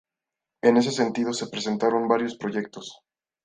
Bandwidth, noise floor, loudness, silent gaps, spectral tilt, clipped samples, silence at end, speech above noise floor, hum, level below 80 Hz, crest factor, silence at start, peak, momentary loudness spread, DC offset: 9.8 kHz; -87 dBFS; -24 LUFS; none; -4.5 dB/octave; under 0.1%; 0.5 s; 64 dB; none; -70 dBFS; 20 dB; 0.65 s; -6 dBFS; 14 LU; under 0.1%